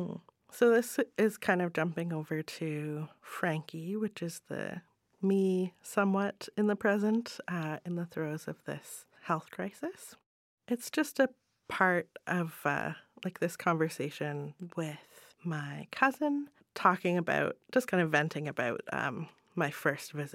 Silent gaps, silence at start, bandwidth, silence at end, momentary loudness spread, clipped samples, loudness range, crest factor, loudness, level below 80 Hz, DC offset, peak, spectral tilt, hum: 10.26-10.58 s; 0 s; 16.5 kHz; 0 s; 13 LU; under 0.1%; 5 LU; 24 dB; -33 LUFS; -78 dBFS; under 0.1%; -10 dBFS; -6 dB/octave; none